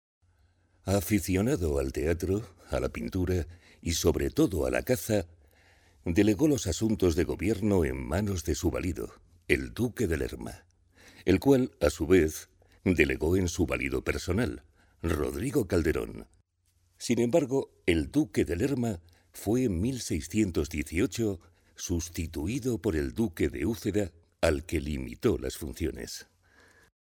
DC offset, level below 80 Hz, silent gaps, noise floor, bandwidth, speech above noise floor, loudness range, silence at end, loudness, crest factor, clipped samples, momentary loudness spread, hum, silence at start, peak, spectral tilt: under 0.1%; -44 dBFS; none; -71 dBFS; 19 kHz; 42 dB; 4 LU; 0.8 s; -29 LUFS; 24 dB; under 0.1%; 11 LU; none; 0.85 s; -6 dBFS; -5.5 dB/octave